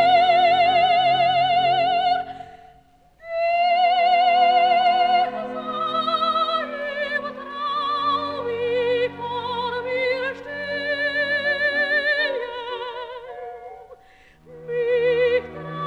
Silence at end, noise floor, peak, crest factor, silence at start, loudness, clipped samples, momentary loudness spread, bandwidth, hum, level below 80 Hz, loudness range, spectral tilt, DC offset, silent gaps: 0 s; -54 dBFS; -6 dBFS; 14 dB; 0 s; -21 LUFS; under 0.1%; 14 LU; 6.2 kHz; none; -60 dBFS; 6 LU; -4.5 dB/octave; under 0.1%; none